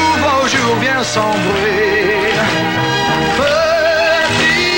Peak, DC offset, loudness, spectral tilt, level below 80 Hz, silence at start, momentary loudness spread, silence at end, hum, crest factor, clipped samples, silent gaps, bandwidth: -2 dBFS; under 0.1%; -13 LUFS; -3.5 dB/octave; -42 dBFS; 0 s; 3 LU; 0 s; none; 12 dB; under 0.1%; none; 16.5 kHz